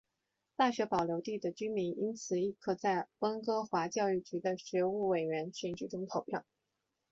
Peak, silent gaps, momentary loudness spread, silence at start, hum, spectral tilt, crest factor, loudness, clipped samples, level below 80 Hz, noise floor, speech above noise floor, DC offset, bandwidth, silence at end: -16 dBFS; none; 7 LU; 0.6 s; none; -4.5 dB/octave; 18 dB; -36 LUFS; under 0.1%; -74 dBFS; -86 dBFS; 51 dB; under 0.1%; 7.8 kHz; 0.7 s